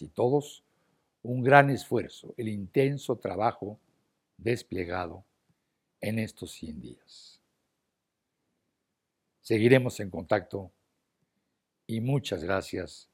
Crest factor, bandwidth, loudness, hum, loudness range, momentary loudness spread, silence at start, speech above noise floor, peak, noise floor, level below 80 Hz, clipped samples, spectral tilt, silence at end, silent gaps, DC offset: 28 dB; 16 kHz; -28 LUFS; none; 13 LU; 19 LU; 0 s; 55 dB; -2 dBFS; -83 dBFS; -66 dBFS; under 0.1%; -6.5 dB/octave; 0.15 s; none; under 0.1%